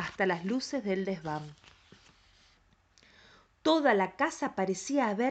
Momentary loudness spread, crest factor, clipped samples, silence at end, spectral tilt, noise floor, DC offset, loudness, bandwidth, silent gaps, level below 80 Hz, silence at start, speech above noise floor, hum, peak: 10 LU; 18 dB; under 0.1%; 0 s; -4.5 dB/octave; -66 dBFS; under 0.1%; -31 LUFS; 9 kHz; none; -68 dBFS; 0 s; 36 dB; none; -14 dBFS